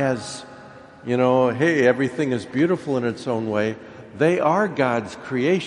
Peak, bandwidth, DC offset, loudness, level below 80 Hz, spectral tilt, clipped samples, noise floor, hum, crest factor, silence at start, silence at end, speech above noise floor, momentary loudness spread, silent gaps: -4 dBFS; 11 kHz; under 0.1%; -21 LUFS; -62 dBFS; -6.5 dB/octave; under 0.1%; -43 dBFS; none; 18 dB; 0 s; 0 s; 22 dB; 16 LU; none